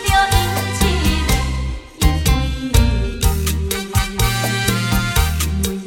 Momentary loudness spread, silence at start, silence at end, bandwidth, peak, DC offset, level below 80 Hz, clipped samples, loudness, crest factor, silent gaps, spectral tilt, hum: 4 LU; 0 s; 0 s; 17.5 kHz; 0 dBFS; under 0.1%; -20 dBFS; under 0.1%; -18 LUFS; 16 dB; none; -4 dB/octave; none